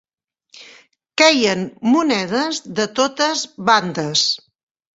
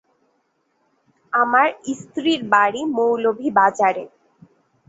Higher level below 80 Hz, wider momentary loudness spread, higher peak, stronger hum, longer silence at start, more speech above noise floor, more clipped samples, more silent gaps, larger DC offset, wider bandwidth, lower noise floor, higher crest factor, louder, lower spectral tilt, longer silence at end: first, -62 dBFS vs -68 dBFS; second, 9 LU vs 12 LU; about the same, -2 dBFS vs -2 dBFS; neither; second, 0.6 s vs 1.35 s; about the same, 50 dB vs 49 dB; neither; neither; neither; about the same, 8.2 kHz vs 8 kHz; about the same, -68 dBFS vs -67 dBFS; about the same, 18 dB vs 18 dB; about the same, -17 LUFS vs -19 LUFS; about the same, -3 dB/octave vs -4 dB/octave; second, 0.6 s vs 0.8 s